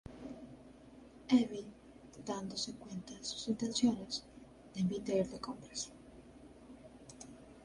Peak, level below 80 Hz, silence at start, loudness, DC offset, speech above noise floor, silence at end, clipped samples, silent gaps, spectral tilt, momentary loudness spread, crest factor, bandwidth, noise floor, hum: -18 dBFS; -66 dBFS; 0.05 s; -38 LUFS; under 0.1%; 21 dB; 0 s; under 0.1%; none; -4.5 dB/octave; 25 LU; 22 dB; 11.5 kHz; -57 dBFS; none